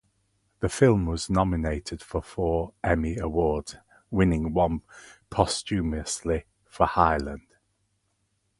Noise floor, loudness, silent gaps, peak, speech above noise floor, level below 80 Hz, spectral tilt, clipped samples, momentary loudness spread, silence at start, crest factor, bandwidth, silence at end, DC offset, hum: -73 dBFS; -26 LUFS; none; -4 dBFS; 48 dB; -38 dBFS; -6 dB/octave; under 0.1%; 11 LU; 0.6 s; 24 dB; 11.5 kHz; 1.2 s; under 0.1%; none